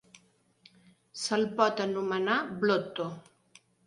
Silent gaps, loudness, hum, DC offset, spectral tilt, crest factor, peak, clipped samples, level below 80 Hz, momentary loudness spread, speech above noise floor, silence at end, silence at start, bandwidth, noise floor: none; -30 LUFS; none; under 0.1%; -4.5 dB/octave; 22 dB; -10 dBFS; under 0.1%; -74 dBFS; 11 LU; 36 dB; 0.65 s; 1.15 s; 11.5 kHz; -65 dBFS